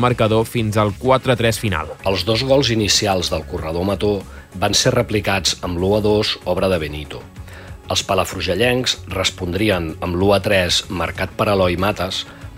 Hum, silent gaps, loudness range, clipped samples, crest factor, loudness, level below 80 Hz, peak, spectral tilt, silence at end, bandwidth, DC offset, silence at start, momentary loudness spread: none; none; 3 LU; under 0.1%; 16 dB; -18 LUFS; -38 dBFS; -2 dBFS; -4 dB/octave; 0 s; 16 kHz; under 0.1%; 0 s; 9 LU